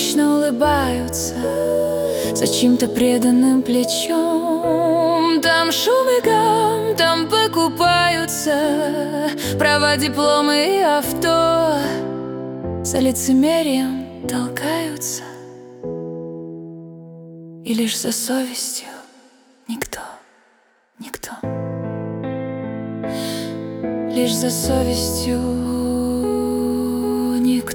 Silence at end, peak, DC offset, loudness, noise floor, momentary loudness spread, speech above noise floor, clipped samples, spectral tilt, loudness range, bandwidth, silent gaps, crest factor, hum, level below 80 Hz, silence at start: 0 s; -4 dBFS; under 0.1%; -18 LUFS; -58 dBFS; 14 LU; 41 dB; under 0.1%; -4 dB/octave; 11 LU; 18 kHz; none; 16 dB; none; -44 dBFS; 0 s